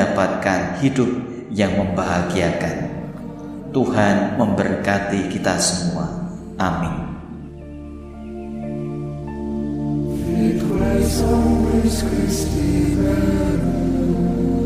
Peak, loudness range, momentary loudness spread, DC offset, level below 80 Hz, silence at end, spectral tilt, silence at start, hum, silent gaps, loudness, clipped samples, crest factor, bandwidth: -4 dBFS; 9 LU; 14 LU; under 0.1%; -32 dBFS; 0 s; -6 dB/octave; 0 s; none; none; -20 LUFS; under 0.1%; 16 dB; 15.5 kHz